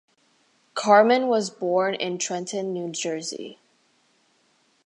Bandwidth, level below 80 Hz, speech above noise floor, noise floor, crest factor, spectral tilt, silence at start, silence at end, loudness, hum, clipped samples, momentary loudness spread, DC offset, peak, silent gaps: 11 kHz; -82 dBFS; 42 dB; -65 dBFS; 22 dB; -3.5 dB/octave; 0.75 s; 1.3 s; -23 LUFS; none; under 0.1%; 16 LU; under 0.1%; -4 dBFS; none